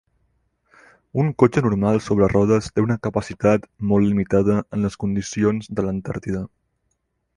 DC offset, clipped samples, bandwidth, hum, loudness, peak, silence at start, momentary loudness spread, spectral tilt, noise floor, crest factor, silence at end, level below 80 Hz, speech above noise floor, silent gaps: under 0.1%; under 0.1%; 10.5 kHz; none; -21 LUFS; -2 dBFS; 1.15 s; 10 LU; -7.5 dB/octave; -72 dBFS; 18 dB; 0.9 s; -44 dBFS; 52 dB; none